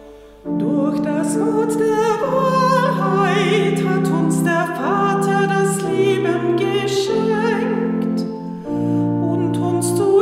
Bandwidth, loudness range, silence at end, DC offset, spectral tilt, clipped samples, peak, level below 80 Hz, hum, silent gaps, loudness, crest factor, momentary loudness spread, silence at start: 15.5 kHz; 3 LU; 0 s; under 0.1%; -6 dB/octave; under 0.1%; -4 dBFS; -58 dBFS; none; none; -18 LUFS; 14 dB; 5 LU; 0 s